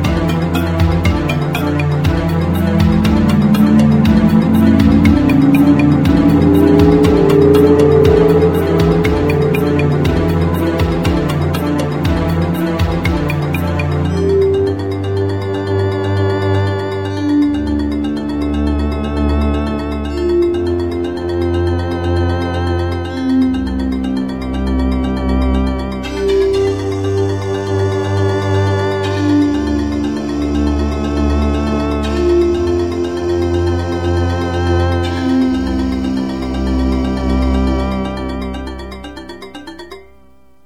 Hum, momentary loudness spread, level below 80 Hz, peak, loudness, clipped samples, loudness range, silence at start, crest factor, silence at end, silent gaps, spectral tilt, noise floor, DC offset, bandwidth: none; 9 LU; -24 dBFS; 0 dBFS; -14 LUFS; under 0.1%; 7 LU; 0 s; 14 dB; 0.65 s; none; -7.5 dB/octave; -49 dBFS; 0.7%; 16.5 kHz